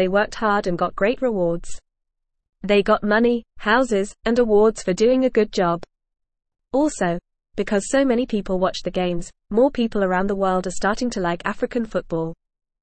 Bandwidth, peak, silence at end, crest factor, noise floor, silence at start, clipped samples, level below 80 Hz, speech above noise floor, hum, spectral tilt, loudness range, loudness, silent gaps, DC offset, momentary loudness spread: 8.8 kHz; -6 dBFS; 0.5 s; 16 dB; -77 dBFS; 0 s; under 0.1%; -42 dBFS; 57 dB; none; -5.5 dB/octave; 4 LU; -21 LUFS; none; 0.4%; 8 LU